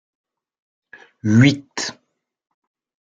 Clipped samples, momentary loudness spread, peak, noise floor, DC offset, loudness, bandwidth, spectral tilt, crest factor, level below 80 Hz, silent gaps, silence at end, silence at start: under 0.1%; 13 LU; -2 dBFS; -71 dBFS; under 0.1%; -18 LUFS; 9 kHz; -5.5 dB/octave; 20 dB; -60 dBFS; none; 1.1 s; 1.25 s